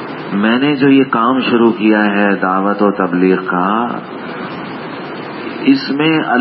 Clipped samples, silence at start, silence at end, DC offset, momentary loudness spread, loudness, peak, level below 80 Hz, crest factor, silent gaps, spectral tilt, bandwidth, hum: under 0.1%; 0 s; 0 s; under 0.1%; 14 LU; -13 LUFS; 0 dBFS; -62 dBFS; 14 dB; none; -10 dB/octave; 5.8 kHz; none